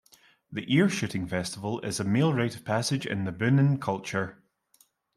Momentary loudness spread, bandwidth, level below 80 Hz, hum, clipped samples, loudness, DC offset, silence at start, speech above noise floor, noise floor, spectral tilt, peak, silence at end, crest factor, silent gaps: 9 LU; 13 kHz; -64 dBFS; none; under 0.1%; -28 LUFS; under 0.1%; 0.5 s; 38 dB; -65 dBFS; -5.5 dB/octave; -10 dBFS; 0.85 s; 18 dB; none